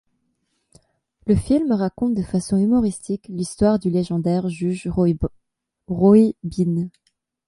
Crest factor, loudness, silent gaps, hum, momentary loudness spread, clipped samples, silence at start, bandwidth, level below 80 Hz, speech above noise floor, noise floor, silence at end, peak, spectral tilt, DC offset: 18 dB; -20 LUFS; none; none; 13 LU; under 0.1%; 1.25 s; 11.5 kHz; -42 dBFS; 56 dB; -75 dBFS; 0.6 s; -4 dBFS; -8 dB/octave; under 0.1%